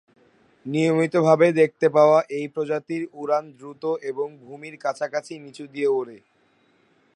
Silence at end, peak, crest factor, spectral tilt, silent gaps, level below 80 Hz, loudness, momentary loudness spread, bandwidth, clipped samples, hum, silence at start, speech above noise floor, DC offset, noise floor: 1 s; -2 dBFS; 20 dB; -6.5 dB/octave; none; -76 dBFS; -22 LUFS; 21 LU; 10.5 kHz; under 0.1%; none; 0.65 s; 40 dB; under 0.1%; -62 dBFS